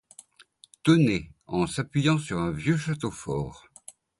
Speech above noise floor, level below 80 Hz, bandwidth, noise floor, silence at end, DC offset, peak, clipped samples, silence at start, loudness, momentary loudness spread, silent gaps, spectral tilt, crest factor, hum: 32 dB; -52 dBFS; 11.5 kHz; -57 dBFS; 0.6 s; under 0.1%; -8 dBFS; under 0.1%; 0.85 s; -26 LUFS; 15 LU; none; -6 dB/octave; 20 dB; none